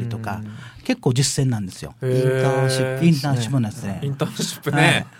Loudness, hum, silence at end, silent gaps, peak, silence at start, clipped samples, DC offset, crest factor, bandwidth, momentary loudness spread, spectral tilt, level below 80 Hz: -21 LUFS; none; 0.1 s; none; -2 dBFS; 0 s; under 0.1%; under 0.1%; 18 dB; 16.5 kHz; 11 LU; -5 dB/octave; -52 dBFS